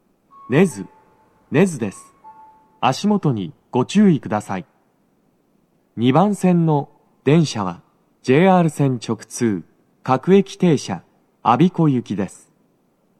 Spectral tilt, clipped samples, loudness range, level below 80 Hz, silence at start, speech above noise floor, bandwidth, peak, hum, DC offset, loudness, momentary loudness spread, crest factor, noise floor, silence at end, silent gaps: -7 dB/octave; under 0.1%; 3 LU; -68 dBFS; 0.5 s; 44 dB; 12.5 kHz; 0 dBFS; none; under 0.1%; -18 LUFS; 14 LU; 18 dB; -61 dBFS; 0.9 s; none